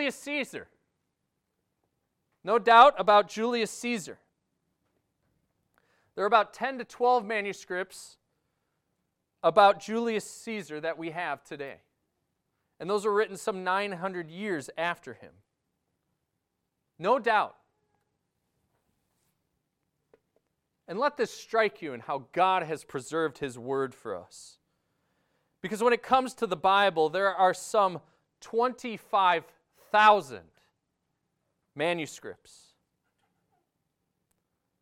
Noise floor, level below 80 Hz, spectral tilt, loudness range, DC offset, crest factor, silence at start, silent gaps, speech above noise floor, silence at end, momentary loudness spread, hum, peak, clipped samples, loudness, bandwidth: -82 dBFS; -74 dBFS; -4 dB/octave; 11 LU; under 0.1%; 24 dB; 0 s; none; 54 dB; 2.5 s; 18 LU; none; -6 dBFS; under 0.1%; -27 LUFS; 15.5 kHz